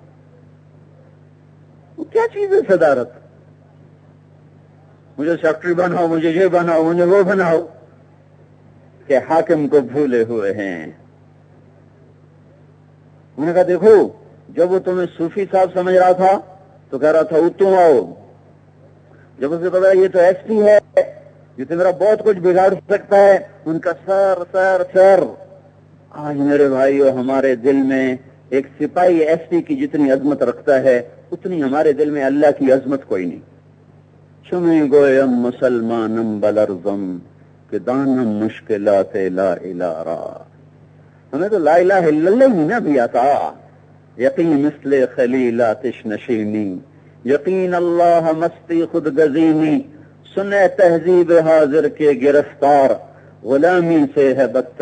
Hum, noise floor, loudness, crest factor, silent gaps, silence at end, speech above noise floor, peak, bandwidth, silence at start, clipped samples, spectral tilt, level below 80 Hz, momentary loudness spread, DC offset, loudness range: none; -47 dBFS; -15 LUFS; 16 dB; none; 0.1 s; 32 dB; 0 dBFS; 9 kHz; 2 s; under 0.1%; -7.5 dB/octave; -66 dBFS; 12 LU; under 0.1%; 6 LU